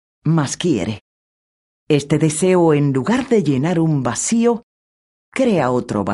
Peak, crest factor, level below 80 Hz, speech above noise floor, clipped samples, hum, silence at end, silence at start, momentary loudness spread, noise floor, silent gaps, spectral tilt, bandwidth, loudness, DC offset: -2 dBFS; 16 dB; -52 dBFS; over 74 dB; under 0.1%; none; 0 s; 0.25 s; 6 LU; under -90 dBFS; 1.01-1.87 s, 4.63-5.32 s; -6 dB/octave; 11.5 kHz; -17 LUFS; under 0.1%